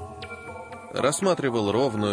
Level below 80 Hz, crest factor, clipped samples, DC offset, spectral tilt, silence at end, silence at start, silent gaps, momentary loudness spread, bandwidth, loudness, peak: -58 dBFS; 16 dB; under 0.1%; under 0.1%; -4.5 dB/octave; 0 s; 0 s; none; 15 LU; 10.5 kHz; -24 LUFS; -10 dBFS